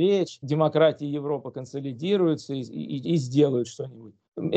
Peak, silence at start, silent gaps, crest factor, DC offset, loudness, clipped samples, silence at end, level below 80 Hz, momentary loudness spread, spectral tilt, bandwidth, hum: -6 dBFS; 0 s; 4.28-4.32 s; 18 dB; under 0.1%; -26 LUFS; under 0.1%; 0 s; -72 dBFS; 12 LU; -7 dB/octave; 8.8 kHz; none